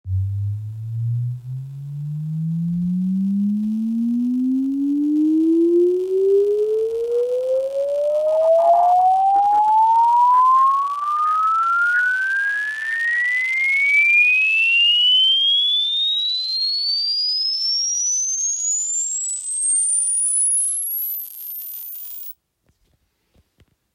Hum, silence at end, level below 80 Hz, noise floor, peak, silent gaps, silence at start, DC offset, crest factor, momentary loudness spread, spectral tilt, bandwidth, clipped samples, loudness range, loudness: none; 1.65 s; -64 dBFS; -66 dBFS; -6 dBFS; none; 0.05 s; under 0.1%; 12 dB; 14 LU; -2.5 dB/octave; 16 kHz; under 0.1%; 9 LU; -17 LUFS